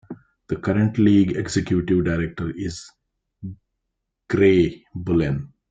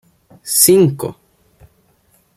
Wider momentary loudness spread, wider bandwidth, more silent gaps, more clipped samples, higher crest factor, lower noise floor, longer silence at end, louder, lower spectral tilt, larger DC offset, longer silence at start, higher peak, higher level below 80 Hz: about the same, 21 LU vs 19 LU; second, 9.2 kHz vs 16 kHz; neither; neither; about the same, 18 dB vs 18 dB; first, -79 dBFS vs -57 dBFS; second, 0.25 s vs 1.25 s; second, -21 LUFS vs -11 LUFS; first, -7 dB/octave vs -4 dB/octave; neither; second, 0.1 s vs 0.45 s; second, -4 dBFS vs 0 dBFS; first, -46 dBFS vs -56 dBFS